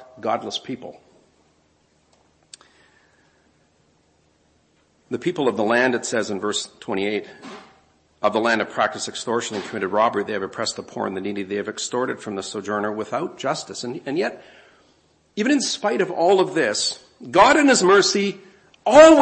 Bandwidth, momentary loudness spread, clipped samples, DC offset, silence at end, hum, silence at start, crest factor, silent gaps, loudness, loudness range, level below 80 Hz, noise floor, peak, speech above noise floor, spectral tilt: 8.8 kHz; 14 LU; under 0.1%; under 0.1%; 0 s; none; 0 s; 22 dB; none; -21 LUFS; 10 LU; -58 dBFS; -62 dBFS; 0 dBFS; 42 dB; -3.5 dB/octave